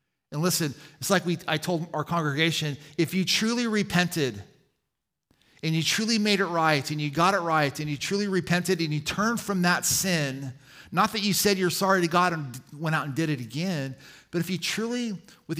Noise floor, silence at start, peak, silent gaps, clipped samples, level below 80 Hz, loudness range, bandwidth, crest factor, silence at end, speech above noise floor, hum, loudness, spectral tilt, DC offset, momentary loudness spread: -83 dBFS; 0.3 s; -6 dBFS; none; under 0.1%; -62 dBFS; 3 LU; 16 kHz; 20 dB; 0 s; 57 dB; none; -26 LUFS; -4 dB/octave; under 0.1%; 10 LU